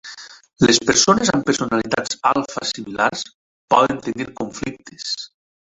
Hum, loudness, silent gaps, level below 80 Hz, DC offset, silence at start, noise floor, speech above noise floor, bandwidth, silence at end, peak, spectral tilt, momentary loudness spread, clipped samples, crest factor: none; -19 LUFS; 3.34-3.68 s; -52 dBFS; under 0.1%; 0.05 s; -39 dBFS; 20 dB; 8.2 kHz; 0.55 s; 0 dBFS; -3 dB/octave; 16 LU; under 0.1%; 20 dB